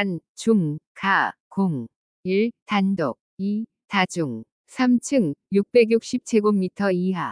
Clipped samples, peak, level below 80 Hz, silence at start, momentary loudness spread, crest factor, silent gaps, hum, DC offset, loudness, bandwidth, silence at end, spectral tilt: under 0.1%; -4 dBFS; -68 dBFS; 0 s; 10 LU; 18 dB; 0.29-0.35 s, 0.87-0.95 s, 1.40-1.51 s, 1.96-2.23 s, 2.62-2.66 s, 3.21-3.37 s, 4.52-4.64 s; none; under 0.1%; -23 LUFS; 10.5 kHz; 0 s; -6 dB/octave